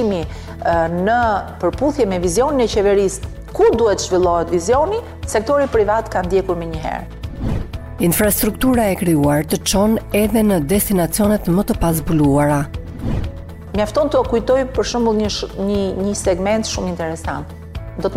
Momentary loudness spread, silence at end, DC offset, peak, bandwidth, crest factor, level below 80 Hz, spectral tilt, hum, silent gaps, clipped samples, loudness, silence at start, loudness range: 11 LU; 0 s; under 0.1%; -4 dBFS; 16 kHz; 12 dB; -32 dBFS; -5.5 dB/octave; none; none; under 0.1%; -17 LUFS; 0 s; 3 LU